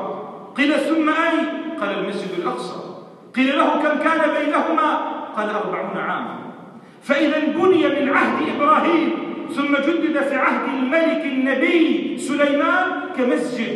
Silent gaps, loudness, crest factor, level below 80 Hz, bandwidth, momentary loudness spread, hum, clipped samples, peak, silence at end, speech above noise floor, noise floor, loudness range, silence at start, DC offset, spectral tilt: none; -19 LUFS; 16 dB; -76 dBFS; 12 kHz; 10 LU; none; under 0.1%; -4 dBFS; 0 s; 22 dB; -41 dBFS; 3 LU; 0 s; under 0.1%; -5 dB/octave